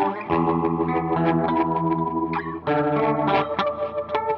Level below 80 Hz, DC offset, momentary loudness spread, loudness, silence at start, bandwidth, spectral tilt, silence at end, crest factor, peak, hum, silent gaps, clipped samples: -50 dBFS; under 0.1%; 5 LU; -23 LUFS; 0 s; 5.8 kHz; -9 dB/octave; 0 s; 14 dB; -8 dBFS; none; none; under 0.1%